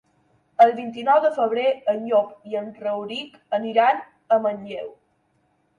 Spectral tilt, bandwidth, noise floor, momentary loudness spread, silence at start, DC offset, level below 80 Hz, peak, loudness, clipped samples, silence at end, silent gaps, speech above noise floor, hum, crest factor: -5.5 dB/octave; 9.2 kHz; -67 dBFS; 15 LU; 0.6 s; under 0.1%; -74 dBFS; -4 dBFS; -22 LUFS; under 0.1%; 0.9 s; none; 45 dB; none; 18 dB